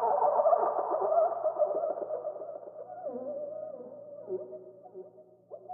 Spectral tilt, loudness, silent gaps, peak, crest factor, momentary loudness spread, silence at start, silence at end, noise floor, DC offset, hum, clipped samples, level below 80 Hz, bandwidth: -1 dB/octave; -31 LUFS; none; -14 dBFS; 18 dB; 23 LU; 0 s; 0 s; -55 dBFS; under 0.1%; none; under 0.1%; under -90 dBFS; 2.1 kHz